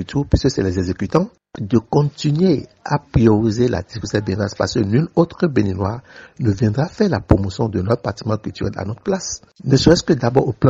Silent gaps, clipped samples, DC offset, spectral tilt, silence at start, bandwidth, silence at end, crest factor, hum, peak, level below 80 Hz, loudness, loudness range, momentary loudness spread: none; under 0.1%; under 0.1%; -6.5 dB/octave; 0 s; 7.8 kHz; 0 s; 16 dB; none; 0 dBFS; -36 dBFS; -18 LUFS; 2 LU; 10 LU